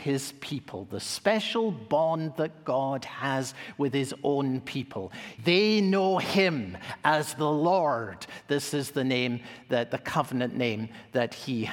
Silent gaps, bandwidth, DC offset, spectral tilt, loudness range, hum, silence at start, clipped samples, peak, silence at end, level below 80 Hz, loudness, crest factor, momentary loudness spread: none; 18 kHz; under 0.1%; -5 dB/octave; 4 LU; none; 0 s; under 0.1%; -6 dBFS; 0 s; -68 dBFS; -28 LUFS; 22 dB; 12 LU